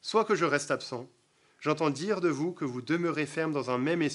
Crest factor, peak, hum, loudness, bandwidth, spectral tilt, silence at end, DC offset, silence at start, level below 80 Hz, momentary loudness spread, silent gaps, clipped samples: 20 dB; -10 dBFS; none; -30 LUFS; 11.5 kHz; -5 dB/octave; 0 s; under 0.1%; 0.05 s; -82 dBFS; 8 LU; none; under 0.1%